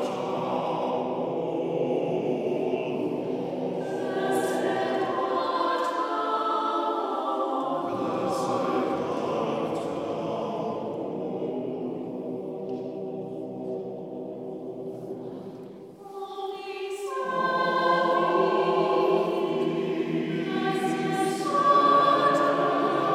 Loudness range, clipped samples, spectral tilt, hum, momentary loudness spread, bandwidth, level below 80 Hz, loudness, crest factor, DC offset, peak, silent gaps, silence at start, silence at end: 11 LU; under 0.1%; -5.5 dB/octave; none; 13 LU; 14.5 kHz; -72 dBFS; -27 LUFS; 18 dB; under 0.1%; -10 dBFS; none; 0 s; 0 s